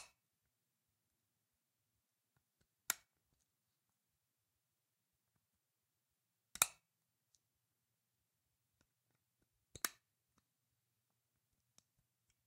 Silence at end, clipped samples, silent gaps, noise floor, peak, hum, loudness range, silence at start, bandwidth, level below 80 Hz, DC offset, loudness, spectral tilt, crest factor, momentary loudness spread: 2.55 s; under 0.1%; none; -89 dBFS; -10 dBFS; none; 7 LU; 0 s; 15.5 kHz; -84 dBFS; under 0.1%; -41 LUFS; 1 dB/octave; 44 dB; 17 LU